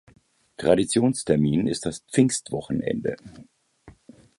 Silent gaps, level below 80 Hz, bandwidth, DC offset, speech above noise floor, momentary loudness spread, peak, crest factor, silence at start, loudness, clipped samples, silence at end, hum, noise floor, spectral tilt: none; -54 dBFS; 11.5 kHz; under 0.1%; 30 dB; 9 LU; -4 dBFS; 20 dB; 0.6 s; -24 LUFS; under 0.1%; 0.5 s; none; -53 dBFS; -5.5 dB/octave